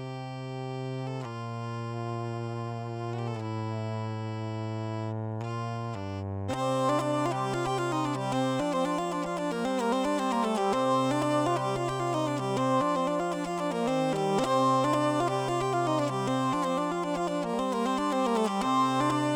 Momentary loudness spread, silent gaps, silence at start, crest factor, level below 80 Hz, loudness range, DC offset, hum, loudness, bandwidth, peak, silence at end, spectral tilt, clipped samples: 9 LU; none; 0 s; 16 dB; -60 dBFS; 7 LU; under 0.1%; none; -29 LUFS; 17.5 kHz; -14 dBFS; 0 s; -6 dB/octave; under 0.1%